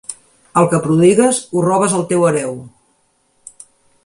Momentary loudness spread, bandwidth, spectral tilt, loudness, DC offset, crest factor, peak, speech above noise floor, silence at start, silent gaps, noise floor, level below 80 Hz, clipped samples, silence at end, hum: 13 LU; 11.5 kHz; -5.5 dB/octave; -14 LUFS; under 0.1%; 16 dB; 0 dBFS; 47 dB; 0.1 s; none; -60 dBFS; -56 dBFS; under 0.1%; 1.4 s; none